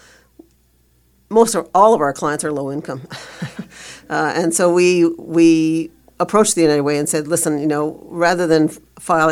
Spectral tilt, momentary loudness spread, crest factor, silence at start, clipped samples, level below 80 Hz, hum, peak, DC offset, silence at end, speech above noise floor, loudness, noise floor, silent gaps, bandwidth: -4.5 dB/octave; 17 LU; 16 dB; 1.3 s; under 0.1%; -54 dBFS; none; 0 dBFS; under 0.1%; 0 s; 41 dB; -16 LUFS; -57 dBFS; none; 15.5 kHz